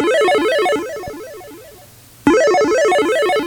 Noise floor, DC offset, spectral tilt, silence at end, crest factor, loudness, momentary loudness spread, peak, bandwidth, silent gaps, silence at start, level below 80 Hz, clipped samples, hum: -43 dBFS; under 0.1%; -3.5 dB/octave; 0 s; 16 dB; -15 LUFS; 18 LU; 0 dBFS; over 20 kHz; none; 0 s; -50 dBFS; under 0.1%; none